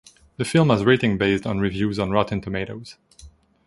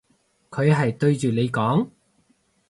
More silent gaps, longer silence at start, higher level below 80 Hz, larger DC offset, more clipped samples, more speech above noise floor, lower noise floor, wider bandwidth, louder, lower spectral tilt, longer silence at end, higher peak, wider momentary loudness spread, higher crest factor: neither; about the same, 0.4 s vs 0.5 s; first, -46 dBFS vs -60 dBFS; neither; neither; second, 28 dB vs 45 dB; second, -49 dBFS vs -65 dBFS; about the same, 11.5 kHz vs 11.5 kHz; about the same, -21 LUFS vs -22 LUFS; about the same, -6.5 dB/octave vs -7.5 dB/octave; second, 0.4 s vs 0.8 s; first, -2 dBFS vs -6 dBFS; first, 12 LU vs 8 LU; about the same, 20 dB vs 18 dB